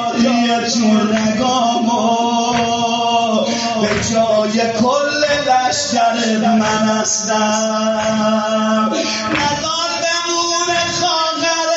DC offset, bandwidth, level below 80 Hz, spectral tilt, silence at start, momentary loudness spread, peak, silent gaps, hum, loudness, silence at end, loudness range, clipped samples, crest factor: under 0.1%; 8 kHz; -48 dBFS; -2.5 dB/octave; 0 s; 2 LU; -2 dBFS; none; none; -15 LUFS; 0 s; 1 LU; under 0.1%; 12 dB